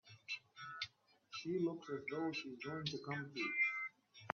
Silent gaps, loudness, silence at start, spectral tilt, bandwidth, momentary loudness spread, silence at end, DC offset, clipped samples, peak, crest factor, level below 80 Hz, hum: none; -43 LUFS; 0.05 s; -3 dB/octave; 7.2 kHz; 12 LU; 0 s; under 0.1%; under 0.1%; -20 dBFS; 24 dB; -84 dBFS; none